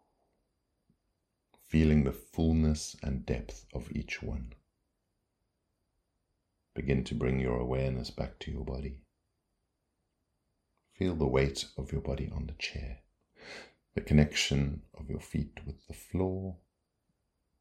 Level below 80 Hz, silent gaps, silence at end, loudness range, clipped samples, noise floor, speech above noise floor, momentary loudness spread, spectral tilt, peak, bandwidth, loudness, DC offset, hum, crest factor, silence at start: -42 dBFS; none; 1.05 s; 9 LU; under 0.1%; -81 dBFS; 49 dB; 18 LU; -6 dB/octave; -8 dBFS; 14.5 kHz; -33 LUFS; under 0.1%; none; 26 dB; 1.7 s